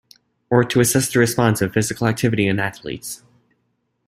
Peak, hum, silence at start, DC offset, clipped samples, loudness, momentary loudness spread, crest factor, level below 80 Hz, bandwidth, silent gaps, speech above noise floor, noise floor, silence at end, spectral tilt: -2 dBFS; none; 0.5 s; under 0.1%; under 0.1%; -18 LUFS; 14 LU; 18 dB; -52 dBFS; 16 kHz; none; 51 dB; -69 dBFS; 0.9 s; -5 dB/octave